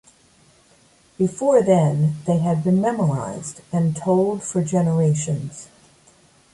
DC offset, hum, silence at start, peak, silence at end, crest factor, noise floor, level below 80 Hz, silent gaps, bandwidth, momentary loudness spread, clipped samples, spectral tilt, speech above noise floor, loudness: under 0.1%; none; 1.2 s; -4 dBFS; 0.9 s; 18 dB; -55 dBFS; -58 dBFS; none; 11.5 kHz; 10 LU; under 0.1%; -7.5 dB/octave; 36 dB; -20 LUFS